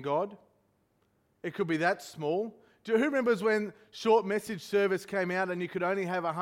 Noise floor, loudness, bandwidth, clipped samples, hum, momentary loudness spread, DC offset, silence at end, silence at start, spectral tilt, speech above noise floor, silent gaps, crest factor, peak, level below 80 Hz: -72 dBFS; -30 LUFS; 16 kHz; under 0.1%; none; 11 LU; under 0.1%; 0 s; 0 s; -5.5 dB/octave; 42 dB; none; 18 dB; -14 dBFS; -74 dBFS